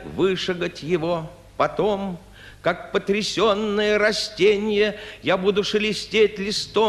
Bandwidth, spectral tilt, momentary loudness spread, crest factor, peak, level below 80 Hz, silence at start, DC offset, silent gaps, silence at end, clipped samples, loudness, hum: 12.5 kHz; -4.5 dB/octave; 8 LU; 16 dB; -6 dBFS; -50 dBFS; 0 s; under 0.1%; none; 0 s; under 0.1%; -22 LUFS; none